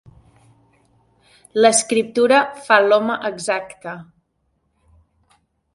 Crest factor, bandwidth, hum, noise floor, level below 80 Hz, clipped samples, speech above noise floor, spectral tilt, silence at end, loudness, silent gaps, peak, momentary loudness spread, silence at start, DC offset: 20 dB; 11.5 kHz; none; -68 dBFS; -64 dBFS; under 0.1%; 51 dB; -2.5 dB/octave; 1.7 s; -17 LUFS; none; 0 dBFS; 19 LU; 1.55 s; under 0.1%